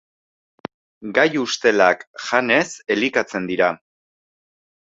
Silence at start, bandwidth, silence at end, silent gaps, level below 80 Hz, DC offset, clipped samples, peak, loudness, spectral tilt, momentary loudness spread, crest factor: 1 s; 8 kHz; 1.2 s; 2.07-2.14 s; -64 dBFS; under 0.1%; under 0.1%; -2 dBFS; -19 LUFS; -3.5 dB/octave; 20 LU; 20 dB